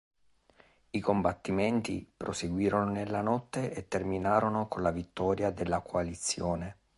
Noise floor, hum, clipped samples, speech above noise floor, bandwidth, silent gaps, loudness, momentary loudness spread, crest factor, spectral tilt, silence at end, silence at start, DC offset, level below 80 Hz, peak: -64 dBFS; none; under 0.1%; 33 dB; 11.5 kHz; none; -32 LUFS; 7 LU; 20 dB; -5.5 dB/octave; 0.25 s; 0.95 s; under 0.1%; -52 dBFS; -12 dBFS